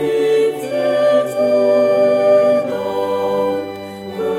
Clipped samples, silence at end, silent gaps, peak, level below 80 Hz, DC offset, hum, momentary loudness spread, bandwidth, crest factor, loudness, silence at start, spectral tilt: under 0.1%; 0 s; none; -4 dBFS; -62 dBFS; under 0.1%; none; 11 LU; 14.5 kHz; 12 dB; -15 LUFS; 0 s; -5.5 dB/octave